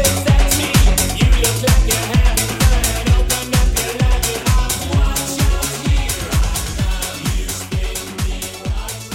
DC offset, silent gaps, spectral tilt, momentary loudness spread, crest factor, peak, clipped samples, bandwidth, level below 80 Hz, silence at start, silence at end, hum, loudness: under 0.1%; none; -4 dB/octave; 9 LU; 14 dB; -2 dBFS; under 0.1%; 17 kHz; -18 dBFS; 0 s; 0 s; none; -17 LUFS